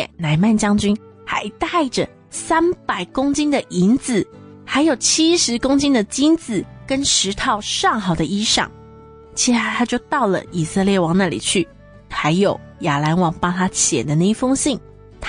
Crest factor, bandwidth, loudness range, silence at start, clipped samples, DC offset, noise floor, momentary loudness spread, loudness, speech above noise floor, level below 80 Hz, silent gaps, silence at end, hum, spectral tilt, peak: 14 dB; 10.5 kHz; 3 LU; 0 s; under 0.1%; under 0.1%; -42 dBFS; 8 LU; -18 LUFS; 24 dB; -44 dBFS; none; 0 s; none; -4 dB/octave; -4 dBFS